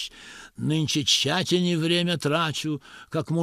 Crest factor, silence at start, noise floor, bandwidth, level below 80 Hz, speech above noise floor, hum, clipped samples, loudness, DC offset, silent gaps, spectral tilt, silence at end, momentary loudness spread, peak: 18 dB; 0 s; -45 dBFS; 15.5 kHz; -60 dBFS; 21 dB; none; under 0.1%; -24 LUFS; under 0.1%; none; -4 dB/octave; 0 s; 14 LU; -8 dBFS